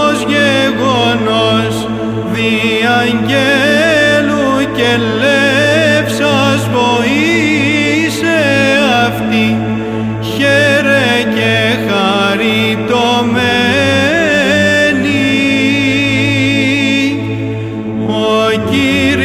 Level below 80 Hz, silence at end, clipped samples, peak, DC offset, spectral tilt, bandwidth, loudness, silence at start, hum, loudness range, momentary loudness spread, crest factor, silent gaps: -40 dBFS; 0 s; under 0.1%; 0 dBFS; under 0.1%; -5 dB/octave; 16 kHz; -11 LUFS; 0 s; none; 2 LU; 6 LU; 10 dB; none